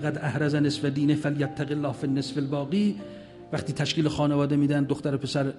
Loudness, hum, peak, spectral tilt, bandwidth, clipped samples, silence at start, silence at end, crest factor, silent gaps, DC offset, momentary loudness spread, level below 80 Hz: -26 LUFS; none; -12 dBFS; -6.5 dB/octave; 11.5 kHz; under 0.1%; 0 s; 0 s; 14 dB; none; under 0.1%; 8 LU; -58 dBFS